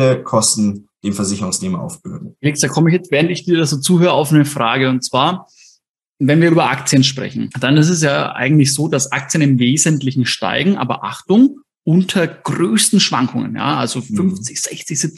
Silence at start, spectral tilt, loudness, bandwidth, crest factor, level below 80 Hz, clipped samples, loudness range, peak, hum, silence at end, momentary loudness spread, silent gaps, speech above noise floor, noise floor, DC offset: 0 s; -4.5 dB/octave; -15 LUFS; 13 kHz; 14 dB; -58 dBFS; under 0.1%; 2 LU; 0 dBFS; none; 0.1 s; 9 LU; 5.89-5.94 s; 43 dB; -58 dBFS; under 0.1%